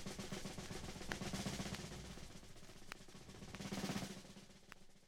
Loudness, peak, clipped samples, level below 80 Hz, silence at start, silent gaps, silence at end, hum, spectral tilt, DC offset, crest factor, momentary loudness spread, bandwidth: -49 LUFS; -24 dBFS; under 0.1%; -60 dBFS; 0 s; none; 0 s; none; -4 dB/octave; under 0.1%; 26 dB; 15 LU; 17 kHz